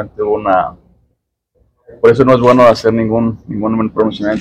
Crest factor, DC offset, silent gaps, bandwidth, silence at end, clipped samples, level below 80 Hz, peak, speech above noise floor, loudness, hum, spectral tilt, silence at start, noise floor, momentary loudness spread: 12 dB; under 0.1%; none; 11 kHz; 0 s; 1%; -42 dBFS; 0 dBFS; 54 dB; -12 LUFS; none; -7.5 dB/octave; 0 s; -65 dBFS; 9 LU